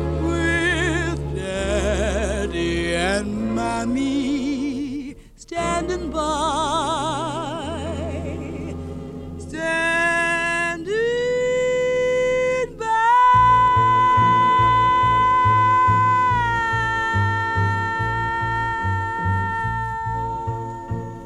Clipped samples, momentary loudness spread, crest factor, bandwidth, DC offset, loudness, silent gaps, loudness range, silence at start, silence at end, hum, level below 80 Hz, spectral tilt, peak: under 0.1%; 13 LU; 14 dB; 11.5 kHz; under 0.1%; -20 LUFS; none; 8 LU; 0 s; 0 s; none; -36 dBFS; -5.5 dB/octave; -6 dBFS